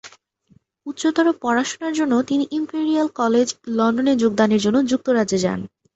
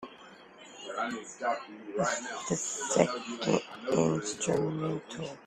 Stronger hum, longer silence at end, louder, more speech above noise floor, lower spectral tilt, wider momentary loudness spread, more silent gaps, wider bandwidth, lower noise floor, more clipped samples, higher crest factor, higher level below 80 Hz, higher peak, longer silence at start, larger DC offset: neither; first, 0.3 s vs 0 s; first, -20 LUFS vs -32 LUFS; first, 39 dB vs 21 dB; about the same, -5 dB/octave vs -4 dB/octave; second, 6 LU vs 17 LU; neither; second, 8.2 kHz vs 13 kHz; first, -58 dBFS vs -52 dBFS; neither; second, 16 dB vs 24 dB; first, -60 dBFS vs -68 dBFS; first, -4 dBFS vs -8 dBFS; about the same, 0.05 s vs 0 s; neither